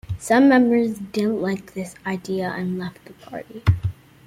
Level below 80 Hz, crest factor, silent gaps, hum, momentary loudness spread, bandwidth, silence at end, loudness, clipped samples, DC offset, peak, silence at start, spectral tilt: -44 dBFS; 18 dB; none; none; 19 LU; 15.5 kHz; 0.35 s; -21 LUFS; under 0.1%; under 0.1%; -4 dBFS; 0.1 s; -7 dB/octave